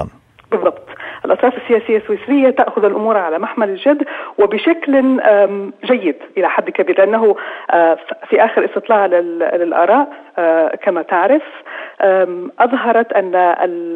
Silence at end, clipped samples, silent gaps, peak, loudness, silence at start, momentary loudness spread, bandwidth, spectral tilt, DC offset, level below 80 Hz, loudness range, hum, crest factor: 0 s; under 0.1%; none; -2 dBFS; -14 LUFS; 0 s; 7 LU; 4.4 kHz; -7.5 dB/octave; under 0.1%; -58 dBFS; 1 LU; none; 12 dB